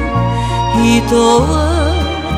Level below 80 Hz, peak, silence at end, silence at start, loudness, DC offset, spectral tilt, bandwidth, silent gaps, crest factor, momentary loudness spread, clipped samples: -22 dBFS; 0 dBFS; 0 s; 0 s; -13 LUFS; under 0.1%; -5.5 dB/octave; 14.5 kHz; none; 12 dB; 5 LU; under 0.1%